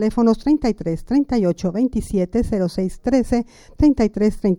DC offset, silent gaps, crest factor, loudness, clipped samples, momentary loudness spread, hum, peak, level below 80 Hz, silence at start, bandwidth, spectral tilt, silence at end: under 0.1%; none; 14 dB; -19 LUFS; under 0.1%; 6 LU; none; -4 dBFS; -34 dBFS; 0 s; 12 kHz; -7.5 dB/octave; 0 s